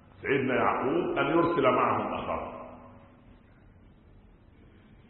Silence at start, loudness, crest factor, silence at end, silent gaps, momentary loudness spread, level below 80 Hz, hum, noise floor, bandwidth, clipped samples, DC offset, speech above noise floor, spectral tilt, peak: 0.2 s; -27 LUFS; 18 dB; 2.1 s; none; 13 LU; -56 dBFS; none; -56 dBFS; 4.3 kHz; under 0.1%; under 0.1%; 29 dB; -10 dB/octave; -12 dBFS